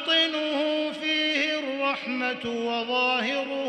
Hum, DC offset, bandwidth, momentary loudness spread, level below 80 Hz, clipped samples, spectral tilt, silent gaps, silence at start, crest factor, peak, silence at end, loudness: none; under 0.1%; 9.6 kHz; 6 LU; -72 dBFS; under 0.1%; -2.5 dB/octave; none; 0 s; 14 dB; -12 dBFS; 0 s; -25 LUFS